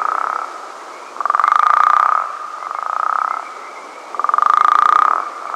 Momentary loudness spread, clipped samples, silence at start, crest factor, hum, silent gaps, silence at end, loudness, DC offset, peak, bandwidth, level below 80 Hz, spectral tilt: 20 LU; 0.1%; 0 s; 16 dB; none; none; 0 s; -15 LUFS; under 0.1%; 0 dBFS; 11.5 kHz; -68 dBFS; -0.5 dB/octave